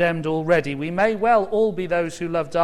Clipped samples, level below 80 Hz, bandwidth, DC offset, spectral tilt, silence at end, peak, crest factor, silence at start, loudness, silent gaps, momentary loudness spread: under 0.1%; -50 dBFS; 12.5 kHz; under 0.1%; -6.5 dB/octave; 0 s; -6 dBFS; 16 dB; 0 s; -21 LUFS; none; 6 LU